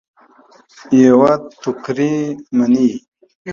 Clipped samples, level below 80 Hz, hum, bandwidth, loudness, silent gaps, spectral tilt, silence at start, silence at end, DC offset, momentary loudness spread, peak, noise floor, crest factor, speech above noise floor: under 0.1%; -58 dBFS; none; 7.2 kHz; -15 LUFS; 3.08-3.12 s, 3.35-3.45 s; -7 dB/octave; 0.9 s; 0 s; under 0.1%; 14 LU; 0 dBFS; -48 dBFS; 16 dB; 34 dB